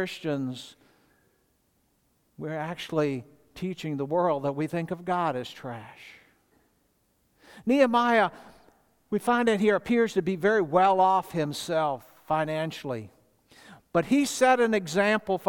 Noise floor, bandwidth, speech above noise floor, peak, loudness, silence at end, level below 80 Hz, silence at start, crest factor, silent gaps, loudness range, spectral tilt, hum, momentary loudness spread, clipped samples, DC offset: -70 dBFS; 18 kHz; 44 dB; -8 dBFS; -26 LUFS; 0 s; -66 dBFS; 0 s; 20 dB; none; 10 LU; -5.5 dB/octave; none; 15 LU; under 0.1%; under 0.1%